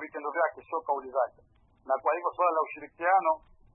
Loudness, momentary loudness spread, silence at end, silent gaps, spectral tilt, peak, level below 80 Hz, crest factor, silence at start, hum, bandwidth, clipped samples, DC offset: -29 LUFS; 9 LU; 0.4 s; none; -8.5 dB/octave; -12 dBFS; -68 dBFS; 18 dB; 0 s; none; 3.7 kHz; under 0.1%; under 0.1%